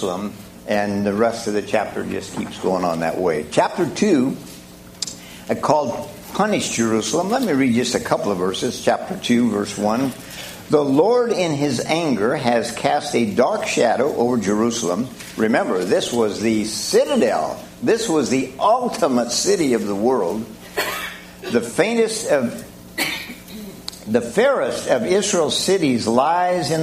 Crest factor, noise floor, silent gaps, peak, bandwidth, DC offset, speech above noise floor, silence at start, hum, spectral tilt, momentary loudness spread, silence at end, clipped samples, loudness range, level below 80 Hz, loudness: 18 dB; -40 dBFS; none; -2 dBFS; 15.5 kHz; under 0.1%; 21 dB; 0 s; none; -4 dB/octave; 11 LU; 0 s; under 0.1%; 3 LU; -54 dBFS; -20 LUFS